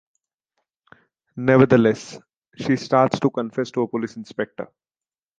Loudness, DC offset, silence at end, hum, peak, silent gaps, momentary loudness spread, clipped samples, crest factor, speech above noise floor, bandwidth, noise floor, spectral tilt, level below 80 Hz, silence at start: -21 LUFS; under 0.1%; 0.75 s; none; -2 dBFS; 2.37-2.42 s; 19 LU; under 0.1%; 20 dB; over 70 dB; 9 kHz; under -90 dBFS; -7 dB/octave; -60 dBFS; 1.35 s